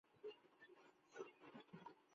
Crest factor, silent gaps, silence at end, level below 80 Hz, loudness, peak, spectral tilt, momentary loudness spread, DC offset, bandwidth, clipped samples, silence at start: 22 dB; none; 0 s; under -90 dBFS; -62 LUFS; -40 dBFS; -3.5 dB/octave; 9 LU; under 0.1%; 7.2 kHz; under 0.1%; 0.05 s